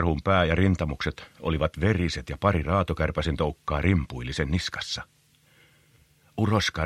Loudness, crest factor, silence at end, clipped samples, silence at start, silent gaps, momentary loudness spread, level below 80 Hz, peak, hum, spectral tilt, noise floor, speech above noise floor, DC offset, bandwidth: -26 LUFS; 20 dB; 0 s; under 0.1%; 0 s; none; 9 LU; -38 dBFS; -6 dBFS; none; -6 dB/octave; -60 dBFS; 35 dB; under 0.1%; 12.5 kHz